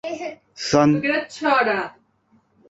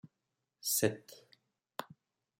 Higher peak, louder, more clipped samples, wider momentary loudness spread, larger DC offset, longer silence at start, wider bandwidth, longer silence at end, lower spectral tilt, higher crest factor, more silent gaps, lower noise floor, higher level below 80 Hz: first, -2 dBFS vs -14 dBFS; first, -20 LUFS vs -35 LUFS; neither; second, 15 LU vs 24 LU; neither; about the same, 0.05 s vs 0.05 s; second, 8 kHz vs 16.5 kHz; first, 0.8 s vs 0.55 s; first, -5 dB/octave vs -3 dB/octave; second, 20 dB vs 26 dB; neither; second, -61 dBFS vs -87 dBFS; first, -58 dBFS vs -84 dBFS